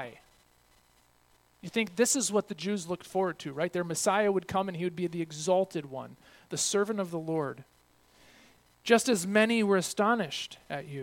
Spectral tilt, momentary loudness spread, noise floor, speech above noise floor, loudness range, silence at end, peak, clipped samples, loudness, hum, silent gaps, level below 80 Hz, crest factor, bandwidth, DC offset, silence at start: -3.5 dB/octave; 14 LU; -65 dBFS; 36 dB; 4 LU; 0 s; -8 dBFS; under 0.1%; -29 LUFS; none; none; -70 dBFS; 22 dB; 17.5 kHz; under 0.1%; 0 s